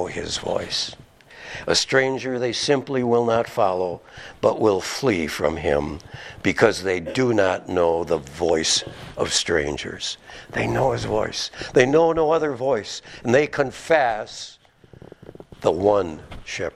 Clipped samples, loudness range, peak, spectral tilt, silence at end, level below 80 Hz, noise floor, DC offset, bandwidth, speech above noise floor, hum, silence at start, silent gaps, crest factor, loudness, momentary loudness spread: under 0.1%; 3 LU; 0 dBFS; -4 dB/octave; 0.05 s; -48 dBFS; -48 dBFS; under 0.1%; 14 kHz; 26 dB; none; 0 s; none; 22 dB; -22 LUFS; 13 LU